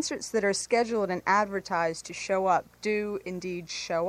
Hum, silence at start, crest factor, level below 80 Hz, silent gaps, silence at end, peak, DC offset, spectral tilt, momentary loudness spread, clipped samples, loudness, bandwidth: none; 0 s; 18 dB; -62 dBFS; none; 0 s; -12 dBFS; under 0.1%; -3.5 dB/octave; 9 LU; under 0.1%; -28 LUFS; 15.5 kHz